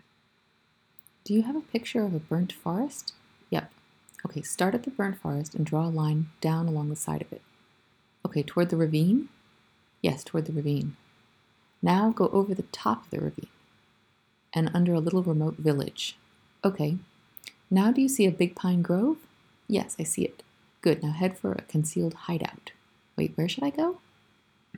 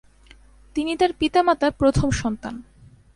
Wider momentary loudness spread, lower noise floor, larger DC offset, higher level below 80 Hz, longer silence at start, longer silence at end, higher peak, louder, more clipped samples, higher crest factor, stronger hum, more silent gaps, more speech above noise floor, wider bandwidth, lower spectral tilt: about the same, 13 LU vs 13 LU; first, -68 dBFS vs -50 dBFS; neither; second, -68 dBFS vs -38 dBFS; first, 1.25 s vs 0.75 s; first, 0.8 s vs 0.55 s; second, -10 dBFS vs -4 dBFS; second, -28 LUFS vs -21 LUFS; neither; about the same, 18 dB vs 18 dB; neither; neither; first, 41 dB vs 30 dB; first, 19 kHz vs 11.5 kHz; about the same, -6 dB/octave vs -5.5 dB/octave